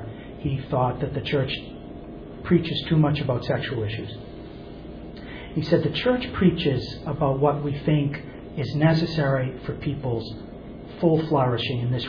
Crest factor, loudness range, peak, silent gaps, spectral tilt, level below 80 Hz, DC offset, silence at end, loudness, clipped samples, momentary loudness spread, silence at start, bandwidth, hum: 18 dB; 3 LU; -6 dBFS; none; -8.5 dB/octave; -44 dBFS; under 0.1%; 0 s; -24 LUFS; under 0.1%; 18 LU; 0 s; 5.4 kHz; none